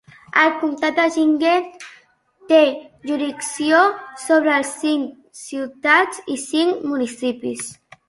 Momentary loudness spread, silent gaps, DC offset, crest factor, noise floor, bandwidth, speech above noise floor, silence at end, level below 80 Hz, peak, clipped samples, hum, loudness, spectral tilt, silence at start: 15 LU; none; under 0.1%; 18 dB; -53 dBFS; 11.5 kHz; 35 dB; 0.35 s; -66 dBFS; -2 dBFS; under 0.1%; none; -18 LUFS; -2.5 dB/octave; 0.35 s